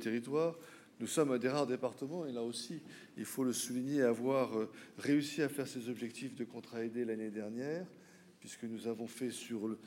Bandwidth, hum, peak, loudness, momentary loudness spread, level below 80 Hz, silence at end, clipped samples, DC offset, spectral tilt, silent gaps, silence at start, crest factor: 16 kHz; none; -18 dBFS; -38 LUFS; 13 LU; under -90 dBFS; 0 s; under 0.1%; under 0.1%; -5 dB/octave; none; 0 s; 20 dB